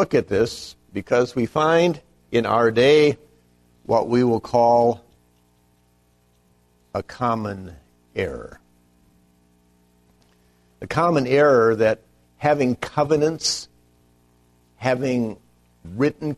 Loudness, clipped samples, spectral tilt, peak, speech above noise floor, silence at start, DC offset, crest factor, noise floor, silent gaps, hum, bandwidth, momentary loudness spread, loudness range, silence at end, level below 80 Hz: -20 LUFS; under 0.1%; -5.5 dB/octave; -4 dBFS; 41 dB; 0 s; under 0.1%; 18 dB; -61 dBFS; none; 60 Hz at -50 dBFS; 13 kHz; 18 LU; 12 LU; 0 s; -54 dBFS